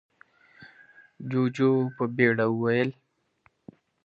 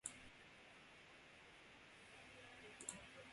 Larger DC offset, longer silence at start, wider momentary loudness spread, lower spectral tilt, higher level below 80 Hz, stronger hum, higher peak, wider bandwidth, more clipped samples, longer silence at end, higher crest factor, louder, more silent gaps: neither; first, 0.6 s vs 0.05 s; about the same, 8 LU vs 10 LU; first, -8 dB/octave vs -1.5 dB/octave; first, -72 dBFS vs -80 dBFS; neither; first, -8 dBFS vs -28 dBFS; second, 7.4 kHz vs 11.5 kHz; neither; first, 1.15 s vs 0 s; second, 20 dB vs 32 dB; first, -25 LUFS vs -58 LUFS; neither